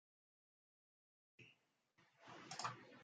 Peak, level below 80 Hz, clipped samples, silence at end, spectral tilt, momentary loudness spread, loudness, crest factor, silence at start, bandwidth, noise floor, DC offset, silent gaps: -32 dBFS; under -90 dBFS; under 0.1%; 0 s; -2.5 dB/octave; 18 LU; -51 LUFS; 28 dB; 1.4 s; 8.8 kHz; -80 dBFS; under 0.1%; none